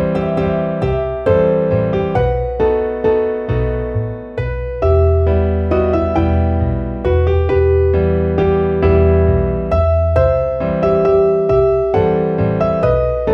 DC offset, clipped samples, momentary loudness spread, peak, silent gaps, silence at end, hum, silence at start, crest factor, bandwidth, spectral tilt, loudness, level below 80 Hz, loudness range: under 0.1%; under 0.1%; 6 LU; -2 dBFS; none; 0 s; none; 0 s; 12 dB; 5.8 kHz; -10 dB/octave; -15 LUFS; -24 dBFS; 3 LU